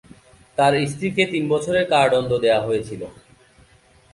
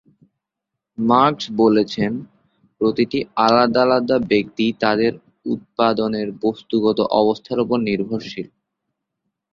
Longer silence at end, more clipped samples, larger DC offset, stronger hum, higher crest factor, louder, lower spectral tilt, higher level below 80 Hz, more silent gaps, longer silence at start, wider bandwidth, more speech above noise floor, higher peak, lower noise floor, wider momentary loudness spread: about the same, 1 s vs 1.05 s; neither; neither; neither; about the same, 18 dB vs 18 dB; about the same, -20 LUFS vs -19 LUFS; second, -5 dB/octave vs -6.5 dB/octave; about the same, -54 dBFS vs -56 dBFS; neither; second, 0.6 s vs 1 s; first, 11.5 kHz vs 7.4 kHz; second, 35 dB vs 64 dB; about the same, -4 dBFS vs -2 dBFS; second, -54 dBFS vs -82 dBFS; about the same, 13 LU vs 12 LU